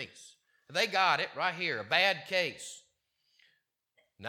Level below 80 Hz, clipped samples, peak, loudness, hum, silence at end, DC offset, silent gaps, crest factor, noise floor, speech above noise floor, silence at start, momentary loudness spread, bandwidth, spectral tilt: -86 dBFS; under 0.1%; -10 dBFS; -29 LUFS; none; 0 s; under 0.1%; none; 24 dB; -76 dBFS; 45 dB; 0 s; 18 LU; 17 kHz; -2 dB/octave